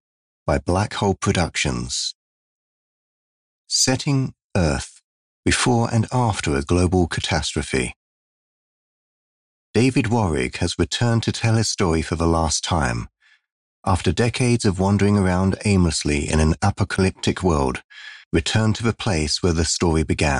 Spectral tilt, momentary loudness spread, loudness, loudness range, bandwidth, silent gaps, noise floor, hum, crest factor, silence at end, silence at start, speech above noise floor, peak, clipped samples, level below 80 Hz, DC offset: -5 dB/octave; 6 LU; -21 LUFS; 5 LU; 11.5 kHz; 2.15-3.65 s, 4.44-4.50 s, 5.04-5.43 s, 7.96-9.74 s, 13.52-13.83 s, 17.84-17.89 s, 18.26-18.31 s; under -90 dBFS; none; 14 dB; 0 s; 0.45 s; over 70 dB; -6 dBFS; under 0.1%; -38 dBFS; under 0.1%